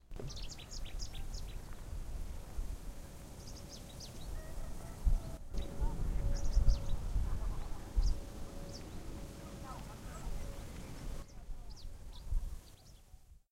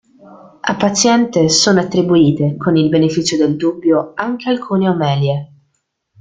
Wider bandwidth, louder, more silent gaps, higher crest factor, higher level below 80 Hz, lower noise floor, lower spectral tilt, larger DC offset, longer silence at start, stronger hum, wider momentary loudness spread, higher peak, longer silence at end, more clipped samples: first, 15.5 kHz vs 9.6 kHz; second, -44 LUFS vs -14 LUFS; neither; first, 22 dB vs 14 dB; first, -38 dBFS vs -52 dBFS; second, -58 dBFS vs -67 dBFS; about the same, -5 dB/octave vs -5 dB/octave; neither; second, 0.05 s vs 0.3 s; neither; first, 14 LU vs 8 LU; second, -16 dBFS vs 0 dBFS; second, 0.15 s vs 0.75 s; neither